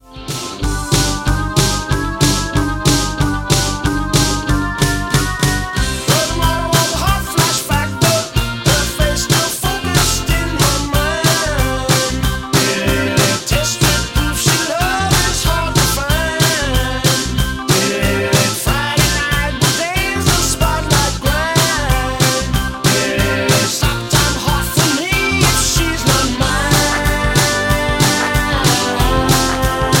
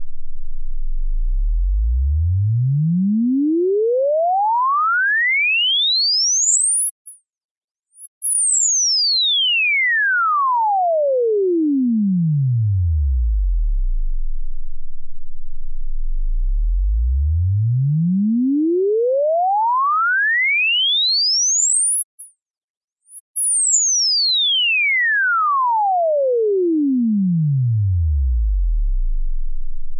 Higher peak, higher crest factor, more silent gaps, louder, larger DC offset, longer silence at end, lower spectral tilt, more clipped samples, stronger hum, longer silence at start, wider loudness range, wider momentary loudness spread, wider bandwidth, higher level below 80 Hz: first, 0 dBFS vs -4 dBFS; about the same, 14 dB vs 12 dB; second, none vs 6.91-7.05 s, 7.44-7.75 s, 8.07-8.21 s, 22.04-22.18 s, 22.42-22.46 s, 22.64-22.88 s, 23.20-23.34 s; about the same, -14 LUFS vs -16 LUFS; neither; about the same, 0 s vs 0 s; about the same, -3.5 dB/octave vs -3 dB/octave; neither; neither; about the same, 0.1 s vs 0 s; second, 2 LU vs 8 LU; second, 4 LU vs 14 LU; first, 17 kHz vs 11.5 kHz; about the same, -24 dBFS vs -24 dBFS